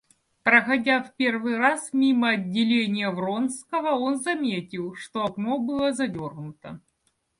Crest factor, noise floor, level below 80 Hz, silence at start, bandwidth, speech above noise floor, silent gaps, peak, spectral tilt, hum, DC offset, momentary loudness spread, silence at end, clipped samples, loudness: 20 dB; -72 dBFS; -66 dBFS; 0.45 s; 11.5 kHz; 48 dB; none; -4 dBFS; -4.5 dB/octave; none; under 0.1%; 14 LU; 0.6 s; under 0.1%; -24 LUFS